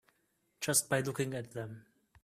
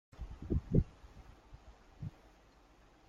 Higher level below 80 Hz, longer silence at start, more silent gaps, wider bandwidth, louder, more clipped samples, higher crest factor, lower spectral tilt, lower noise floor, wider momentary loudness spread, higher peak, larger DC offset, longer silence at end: second, -72 dBFS vs -46 dBFS; first, 0.6 s vs 0.2 s; neither; first, 15.5 kHz vs 7.6 kHz; first, -34 LUFS vs -39 LUFS; neither; about the same, 22 dB vs 24 dB; second, -3.5 dB/octave vs -10 dB/octave; first, -77 dBFS vs -64 dBFS; second, 16 LU vs 26 LU; about the same, -16 dBFS vs -16 dBFS; neither; second, 0.4 s vs 1 s